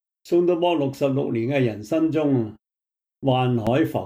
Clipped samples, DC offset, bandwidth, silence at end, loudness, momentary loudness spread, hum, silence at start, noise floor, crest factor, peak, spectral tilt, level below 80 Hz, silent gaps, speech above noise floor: under 0.1%; under 0.1%; 16 kHz; 0 s; -22 LUFS; 3 LU; none; 0.25 s; -87 dBFS; 14 dB; -8 dBFS; -8 dB/octave; -58 dBFS; none; 66 dB